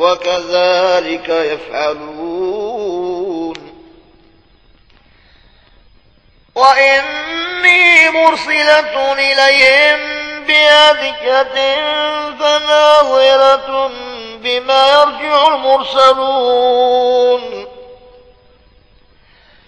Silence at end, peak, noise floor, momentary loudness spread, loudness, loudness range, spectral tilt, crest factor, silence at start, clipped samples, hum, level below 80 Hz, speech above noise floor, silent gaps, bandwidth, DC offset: 1.7 s; 0 dBFS; -49 dBFS; 14 LU; -11 LUFS; 13 LU; -1.5 dB/octave; 12 dB; 0 s; 0.4%; none; -50 dBFS; 38 dB; none; 11 kHz; 0.1%